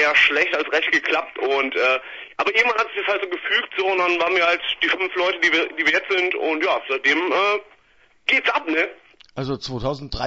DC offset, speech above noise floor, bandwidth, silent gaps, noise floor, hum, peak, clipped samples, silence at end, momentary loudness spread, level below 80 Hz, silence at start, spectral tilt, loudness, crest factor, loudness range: under 0.1%; 36 dB; 8 kHz; none; -56 dBFS; none; -4 dBFS; under 0.1%; 0 s; 9 LU; -50 dBFS; 0 s; -3.5 dB/octave; -20 LUFS; 18 dB; 2 LU